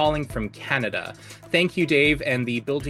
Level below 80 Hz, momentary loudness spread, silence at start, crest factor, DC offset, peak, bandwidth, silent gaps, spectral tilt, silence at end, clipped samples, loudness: -44 dBFS; 12 LU; 0 s; 18 dB; under 0.1%; -4 dBFS; 15 kHz; none; -5.5 dB/octave; 0 s; under 0.1%; -23 LUFS